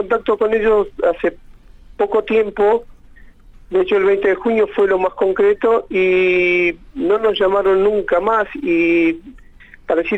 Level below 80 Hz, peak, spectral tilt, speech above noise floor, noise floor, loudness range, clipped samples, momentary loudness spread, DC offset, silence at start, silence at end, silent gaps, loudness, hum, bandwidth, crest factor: -44 dBFS; -6 dBFS; -6.5 dB/octave; 27 dB; -42 dBFS; 3 LU; under 0.1%; 6 LU; under 0.1%; 0 s; 0 s; none; -16 LUFS; none; 8 kHz; 10 dB